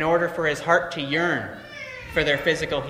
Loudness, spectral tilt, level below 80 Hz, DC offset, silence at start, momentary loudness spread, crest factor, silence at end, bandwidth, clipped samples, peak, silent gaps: -23 LUFS; -4.5 dB/octave; -48 dBFS; under 0.1%; 0 s; 14 LU; 20 dB; 0 s; 15.5 kHz; under 0.1%; -4 dBFS; none